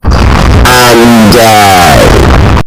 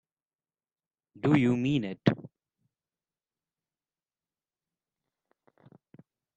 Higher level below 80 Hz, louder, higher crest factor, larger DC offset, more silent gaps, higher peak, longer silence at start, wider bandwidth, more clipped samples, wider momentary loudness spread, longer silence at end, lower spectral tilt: first, -10 dBFS vs -68 dBFS; first, -2 LUFS vs -28 LUFS; second, 2 dB vs 26 dB; neither; neither; first, 0 dBFS vs -8 dBFS; second, 0.05 s vs 1.25 s; first, over 20 kHz vs 8.4 kHz; first, 20% vs under 0.1%; second, 3 LU vs 7 LU; second, 0 s vs 4.15 s; second, -5 dB/octave vs -8 dB/octave